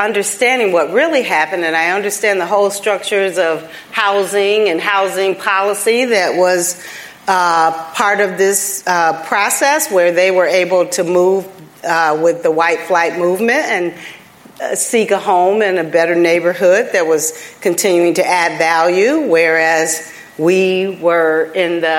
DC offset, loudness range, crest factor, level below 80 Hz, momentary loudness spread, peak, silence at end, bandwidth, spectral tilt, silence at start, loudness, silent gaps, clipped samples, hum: under 0.1%; 2 LU; 14 dB; -68 dBFS; 6 LU; 0 dBFS; 0 s; 16.5 kHz; -3 dB/octave; 0 s; -13 LUFS; none; under 0.1%; none